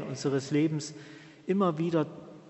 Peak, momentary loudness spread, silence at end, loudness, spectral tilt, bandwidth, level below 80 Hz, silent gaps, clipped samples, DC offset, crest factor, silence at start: -14 dBFS; 16 LU; 0 s; -30 LUFS; -6.5 dB/octave; 8.2 kHz; -74 dBFS; none; under 0.1%; under 0.1%; 16 dB; 0 s